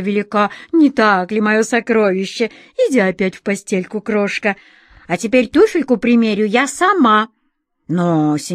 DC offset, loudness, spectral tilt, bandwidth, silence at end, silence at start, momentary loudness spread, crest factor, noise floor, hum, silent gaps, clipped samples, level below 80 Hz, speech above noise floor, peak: under 0.1%; -15 LUFS; -5.5 dB/octave; 14.5 kHz; 0 s; 0 s; 9 LU; 14 dB; -67 dBFS; none; none; under 0.1%; -54 dBFS; 52 dB; 0 dBFS